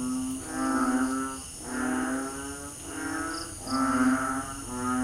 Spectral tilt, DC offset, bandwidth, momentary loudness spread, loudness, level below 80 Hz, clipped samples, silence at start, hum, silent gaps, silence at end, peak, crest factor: -3.5 dB/octave; under 0.1%; 15.5 kHz; 10 LU; -30 LUFS; -50 dBFS; under 0.1%; 0 s; none; none; 0 s; -14 dBFS; 16 dB